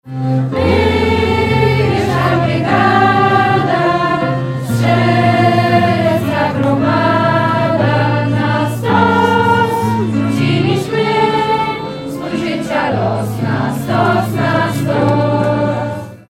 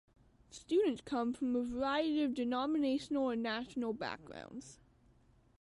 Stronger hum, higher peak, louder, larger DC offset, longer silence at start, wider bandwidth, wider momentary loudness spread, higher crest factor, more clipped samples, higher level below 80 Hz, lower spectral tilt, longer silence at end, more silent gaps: neither; first, 0 dBFS vs -22 dBFS; first, -13 LUFS vs -36 LUFS; neither; second, 0.05 s vs 0.5 s; first, 16 kHz vs 11.5 kHz; second, 6 LU vs 16 LU; about the same, 12 dB vs 14 dB; neither; first, -38 dBFS vs -66 dBFS; first, -7 dB/octave vs -5 dB/octave; second, 0.1 s vs 0.85 s; neither